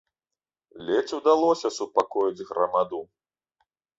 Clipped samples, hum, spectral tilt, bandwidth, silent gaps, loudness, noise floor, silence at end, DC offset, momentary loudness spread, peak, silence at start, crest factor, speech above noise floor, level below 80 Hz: under 0.1%; none; -4 dB/octave; 8 kHz; none; -25 LUFS; under -90 dBFS; 0.95 s; under 0.1%; 8 LU; -6 dBFS; 0.75 s; 20 dB; over 66 dB; -70 dBFS